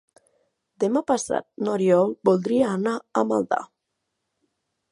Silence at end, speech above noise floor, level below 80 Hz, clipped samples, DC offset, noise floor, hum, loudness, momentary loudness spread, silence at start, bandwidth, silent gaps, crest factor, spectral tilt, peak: 1.25 s; 57 dB; -68 dBFS; under 0.1%; under 0.1%; -79 dBFS; none; -23 LUFS; 8 LU; 0.8 s; 11.5 kHz; none; 20 dB; -6 dB/octave; -4 dBFS